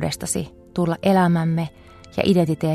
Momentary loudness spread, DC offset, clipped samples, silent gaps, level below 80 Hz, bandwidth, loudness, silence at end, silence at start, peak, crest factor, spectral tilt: 12 LU; under 0.1%; under 0.1%; none; -50 dBFS; 14 kHz; -21 LUFS; 0 s; 0 s; -4 dBFS; 18 dB; -6 dB/octave